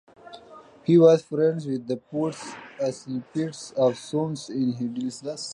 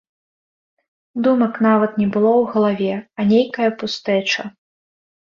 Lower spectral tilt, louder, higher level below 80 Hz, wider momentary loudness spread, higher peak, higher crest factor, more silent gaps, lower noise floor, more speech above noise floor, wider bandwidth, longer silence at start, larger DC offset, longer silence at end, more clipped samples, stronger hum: about the same, -6.5 dB/octave vs -6 dB/octave; second, -25 LUFS vs -18 LUFS; second, -70 dBFS vs -62 dBFS; first, 16 LU vs 7 LU; about the same, -4 dBFS vs -4 dBFS; about the same, 20 dB vs 16 dB; neither; second, -48 dBFS vs under -90 dBFS; second, 24 dB vs over 73 dB; first, 11 kHz vs 7.2 kHz; second, 0.25 s vs 1.15 s; neither; second, 0 s vs 0.85 s; neither; neither